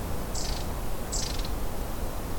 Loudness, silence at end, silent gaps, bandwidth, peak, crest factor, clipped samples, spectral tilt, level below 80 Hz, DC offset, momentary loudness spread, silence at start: -33 LUFS; 0 s; none; 18 kHz; -16 dBFS; 14 dB; under 0.1%; -4 dB/octave; -34 dBFS; under 0.1%; 4 LU; 0 s